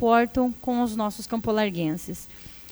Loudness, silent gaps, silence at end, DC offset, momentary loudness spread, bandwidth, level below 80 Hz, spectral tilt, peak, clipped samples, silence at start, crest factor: -25 LUFS; none; 0 s; under 0.1%; 16 LU; over 20 kHz; -50 dBFS; -5.5 dB/octave; -8 dBFS; under 0.1%; 0 s; 18 dB